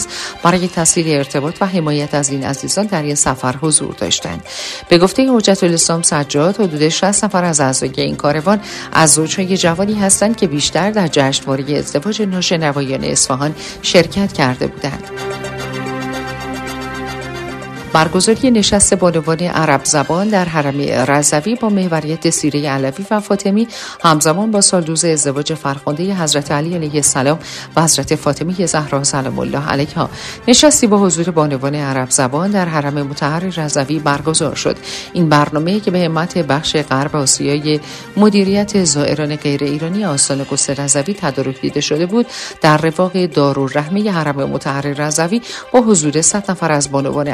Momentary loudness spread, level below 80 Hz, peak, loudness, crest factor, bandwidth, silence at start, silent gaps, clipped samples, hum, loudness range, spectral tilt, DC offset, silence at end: 9 LU; -44 dBFS; 0 dBFS; -14 LUFS; 14 dB; 14 kHz; 0 s; none; under 0.1%; none; 3 LU; -4 dB/octave; under 0.1%; 0 s